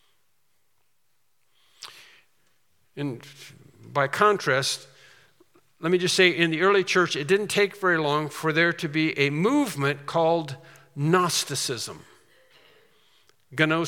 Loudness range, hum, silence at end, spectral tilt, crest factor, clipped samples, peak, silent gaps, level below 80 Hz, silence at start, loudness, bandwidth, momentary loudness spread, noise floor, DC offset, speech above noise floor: 12 LU; none; 0 s; -4 dB/octave; 22 dB; under 0.1%; -4 dBFS; none; -76 dBFS; 1.8 s; -23 LUFS; 17.5 kHz; 18 LU; -74 dBFS; under 0.1%; 50 dB